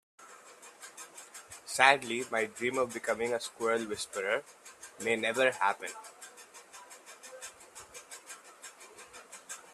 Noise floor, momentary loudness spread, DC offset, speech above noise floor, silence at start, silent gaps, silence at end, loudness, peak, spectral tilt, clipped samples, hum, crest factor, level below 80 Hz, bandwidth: -54 dBFS; 22 LU; under 0.1%; 23 dB; 0.2 s; none; 0 s; -31 LUFS; -6 dBFS; -2 dB/octave; under 0.1%; none; 30 dB; -76 dBFS; 13 kHz